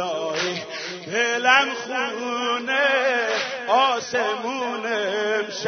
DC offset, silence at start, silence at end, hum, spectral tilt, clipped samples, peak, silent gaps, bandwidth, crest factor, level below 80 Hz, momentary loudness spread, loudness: under 0.1%; 0 s; 0 s; none; -2 dB/octave; under 0.1%; -2 dBFS; none; 6.6 kHz; 20 dB; -78 dBFS; 9 LU; -22 LUFS